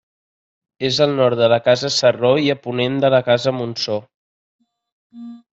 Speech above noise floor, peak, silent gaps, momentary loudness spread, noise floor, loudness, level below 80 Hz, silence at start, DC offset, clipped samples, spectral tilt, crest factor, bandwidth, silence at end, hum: over 73 dB; -2 dBFS; 4.14-4.59 s, 4.92-5.10 s; 9 LU; under -90 dBFS; -17 LUFS; -62 dBFS; 0.8 s; under 0.1%; under 0.1%; -5 dB/octave; 16 dB; 8 kHz; 0.15 s; none